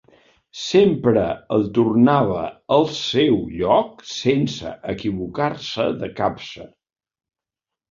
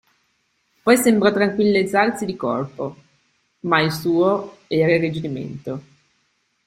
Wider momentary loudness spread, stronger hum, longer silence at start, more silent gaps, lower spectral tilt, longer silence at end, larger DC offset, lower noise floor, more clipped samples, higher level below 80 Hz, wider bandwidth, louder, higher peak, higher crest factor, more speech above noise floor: about the same, 13 LU vs 15 LU; neither; second, 0.55 s vs 0.85 s; neither; about the same, -6 dB/octave vs -5.5 dB/octave; first, 1.25 s vs 0.85 s; neither; first, -87 dBFS vs -67 dBFS; neither; first, -50 dBFS vs -60 dBFS; second, 7.6 kHz vs 16 kHz; about the same, -20 LUFS vs -19 LUFS; about the same, -2 dBFS vs -2 dBFS; about the same, 18 dB vs 20 dB; first, 68 dB vs 48 dB